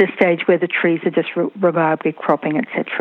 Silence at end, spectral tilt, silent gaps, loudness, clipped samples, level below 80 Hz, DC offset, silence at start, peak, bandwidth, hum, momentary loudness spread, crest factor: 0 s; -9 dB/octave; none; -18 LUFS; under 0.1%; -70 dBFS; under 0.1%; 0 s; -2 dBFS; 4.2 kHz; none; 5 LU; 16 dB